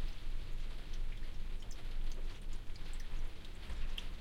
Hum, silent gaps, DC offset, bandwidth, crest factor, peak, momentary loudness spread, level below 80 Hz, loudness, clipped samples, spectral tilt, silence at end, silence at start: none; none; under 0.1%; 9.2 kHz; 10 dB; -26 dBFS; 4 LU; -40 dBFS; -49 LUFS; under 0.1%; -4.5 dB/octave; 0 s; 0 s